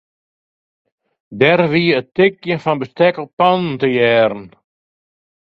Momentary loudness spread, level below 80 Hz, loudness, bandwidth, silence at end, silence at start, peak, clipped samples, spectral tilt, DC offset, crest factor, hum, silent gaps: 6 LU; -58 dBFS; -15 LUFS; 6.4 kHz; 1.1 s; 1.3 s; 0 dBFS; under 0.1%; -8 dB/octave; under 0.1%; 18 dB; none; 3.33-3.38 s